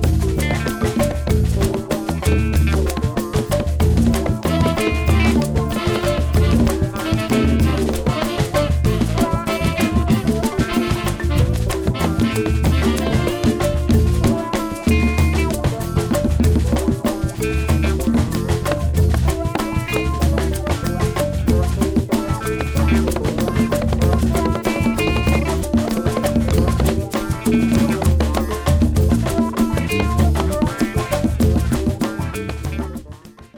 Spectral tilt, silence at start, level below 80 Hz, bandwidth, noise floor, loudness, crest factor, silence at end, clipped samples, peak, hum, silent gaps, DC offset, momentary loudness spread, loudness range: -6.5 dB/octave; 0 s; -24 dBFS; over 20 kHz; -38 dBFS; -19 LUFS; 10 dB; 0 s; under 0.1%; -6 dBFS; none; none; under 0.1%; 5 LU; 2 LU